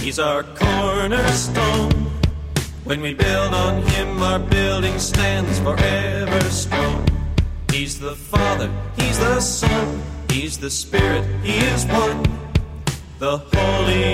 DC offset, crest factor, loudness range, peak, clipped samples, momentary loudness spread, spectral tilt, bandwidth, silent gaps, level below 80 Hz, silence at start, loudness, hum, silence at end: under 0.1%; 18 dB; 2 LU; 0 dBFS; under 0.1%; 6 LU; -4.5 dB/octave; 16 kHz; none; -28 dBFS; 0 s; -20 LUFS; none; 0 s